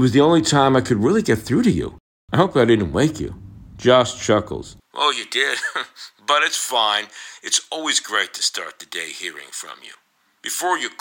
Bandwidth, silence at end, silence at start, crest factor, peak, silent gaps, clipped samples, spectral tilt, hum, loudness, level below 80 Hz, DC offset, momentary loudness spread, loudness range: 17.5 kHz; 0.1 s; 0 s; 18 dB; -2 dBFS; 2.00-2.28 s; under 0.1%; -4 dB/octave; none; -19 LUFS; -48 dBFS; under 0.1%; 16 LU; 5 LU